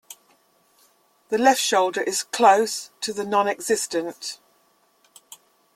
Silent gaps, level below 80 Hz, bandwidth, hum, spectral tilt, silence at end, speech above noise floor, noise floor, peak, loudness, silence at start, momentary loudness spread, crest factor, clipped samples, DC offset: none; -72 dBFS; 16 kHz; none; -2 dB/octave; 1.4 s; 41 dB; -63 dBFS; -2 dBFS; -21 LUFS; 0.1 s; 14 LU; 22 dB; under 0.1%; under 0.1%